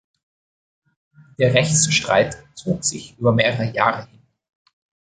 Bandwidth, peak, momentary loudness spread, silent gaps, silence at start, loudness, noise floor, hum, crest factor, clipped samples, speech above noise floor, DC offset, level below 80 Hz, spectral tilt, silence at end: 9.6 kHz; 0 dBFS; 9 LU; none; 1.4 s; -19 LUFS; under -90 dBFS; none; 22 dB; under 0.1%; over 71 dB; under 0.1%; -52 dBFS; -3.5 dB/octave; 1 s